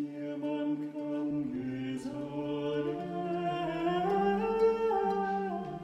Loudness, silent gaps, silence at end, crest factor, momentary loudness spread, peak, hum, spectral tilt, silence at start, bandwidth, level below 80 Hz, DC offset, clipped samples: -33 LUFS; none; 0 s; 14 dB; 9 LU; -18 dBFS; none; -7.5 dB/octave; 0 s; 10.5 kHz; -62 dBFS; under 0.1%; under 0.1%